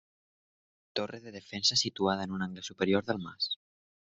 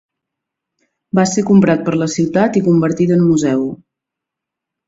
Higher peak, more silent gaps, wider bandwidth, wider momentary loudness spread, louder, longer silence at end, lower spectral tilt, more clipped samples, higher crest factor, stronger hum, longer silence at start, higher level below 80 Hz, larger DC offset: second, -12 dBFS vs 0 dBFS; neither; about the same, 8.2 kHz vs 7.8 kHz; first, 13 LU vs 6 LU; second, -32 LUFS vs -14 LUFS; second, 0.5 s vs 1.15 s; second, -3.5 dB/octave vs -6.5 dB/octave; neither; first, 22 dB vs 16 dB; neither; second, 0.95 s vs 1.15 s; second, -70 dBFS vs -54 dBFS; neither